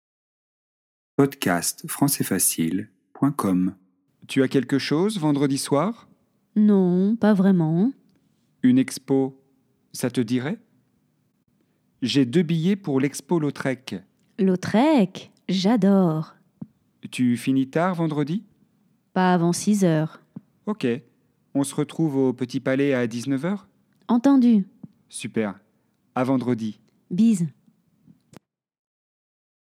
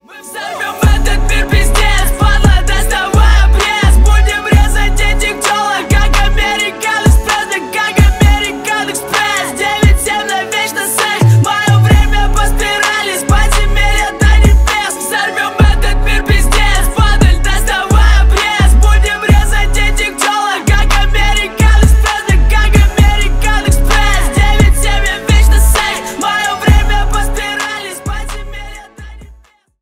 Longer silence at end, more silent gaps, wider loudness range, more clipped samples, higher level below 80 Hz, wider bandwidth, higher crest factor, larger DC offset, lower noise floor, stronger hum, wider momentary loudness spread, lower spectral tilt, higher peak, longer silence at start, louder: first, 2.15 s vs 0.5 s; neither; first, 5 LU vs 2 LU; neither; second, -74 dBFS vs -12 dBFS; about the same, 16.5 kHz vs 16 kHz; first, 18 dB vs 10 dB; neither; first, -68 dBFS vs -43 dBFS; neither; first, 13 LU vs 6 LU; first, -5.5 dB/octave vs -4 dB/octave; second, -4 dBFS vs 0 dBFS; first, 1.2 s vs 0.1 s; second, -23 LUFS vs -11 LUFS